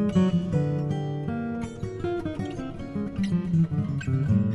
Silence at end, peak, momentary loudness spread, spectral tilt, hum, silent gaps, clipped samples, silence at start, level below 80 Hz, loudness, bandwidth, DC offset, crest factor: 0 s; -12 dBFS; 9 LU; -8.5 dB/octave; none; none; under 0.1%; 0 s; -48 dBFS; -28 LUFS; 11 kHz; under 0.1%; 14 dB